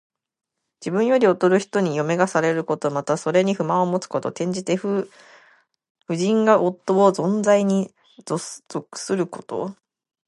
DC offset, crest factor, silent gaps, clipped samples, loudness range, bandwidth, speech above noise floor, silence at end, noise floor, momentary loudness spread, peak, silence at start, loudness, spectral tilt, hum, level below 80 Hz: under 0.1%; 20 dB; 5.90-5.95 s; under 0.1%; 3 LU; 11.5 kHz; 37 dB; 0.55 s; -57 dBFS; 12 LU; -2 dBFS; 0.8 s; -21 LUFS; -6 dB/octave; none; -72 dBFS